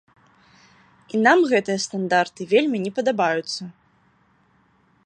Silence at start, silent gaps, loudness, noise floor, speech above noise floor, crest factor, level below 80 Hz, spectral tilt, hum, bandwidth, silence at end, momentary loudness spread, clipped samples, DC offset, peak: 1.15 s; none; -21 LUFS; -61 dBFS; 40 dB; 20 dB; -72 dBFS; -4.5 dB/octave; none; 10.5 kHz; 1.35 s; 12 LU; under 0.1%; under 0.1%; -2 dBFS